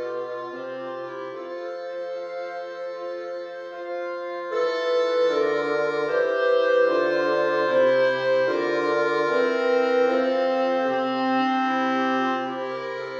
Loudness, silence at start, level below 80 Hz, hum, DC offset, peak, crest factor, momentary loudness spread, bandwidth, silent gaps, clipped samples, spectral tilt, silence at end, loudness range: -24 LUFS; 0 s; -78 dBFS; none; under 0.1%; -10 dBFS; 14 dB; 13 LU; 7.4 kHz; none; under 0.1%; -5 dB/octave; 0 s; 11 LU